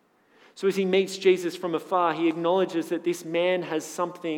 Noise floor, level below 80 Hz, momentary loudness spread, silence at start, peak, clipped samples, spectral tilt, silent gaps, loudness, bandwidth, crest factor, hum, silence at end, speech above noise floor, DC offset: -59 dBFS; under -90 dBFS; 7 LU; 0.55 s; -8 dBFS; under 0.1%; -5 dB/octave; none; -26 LUFS; 16.5 kHz; 16 dB; none; 0 s; 34 dB; under 0.1%